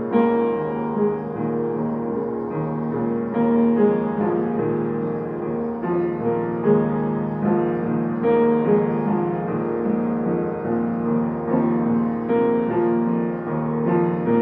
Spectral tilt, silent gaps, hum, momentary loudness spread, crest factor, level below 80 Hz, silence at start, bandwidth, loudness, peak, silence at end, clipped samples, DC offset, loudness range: -11.5 dB/octave; none; none; 7 LU; 16 dB; -54 dBFS; 0 s; 3.8 kHz; -22 LUFS; -6 dBFS; 0 s; under 0.1%; under 0.1%; 2 LU